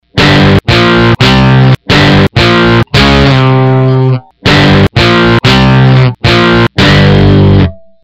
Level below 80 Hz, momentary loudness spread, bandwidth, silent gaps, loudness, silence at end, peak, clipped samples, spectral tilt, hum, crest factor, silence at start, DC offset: -20 dBFS; 3 LU; 8.8 kHz; none; -5 LUFS; 0.3 s; 0 dBFS; 1%; -6.5 dB/octave; none; 6 dB; 0.15 s; under 0.1%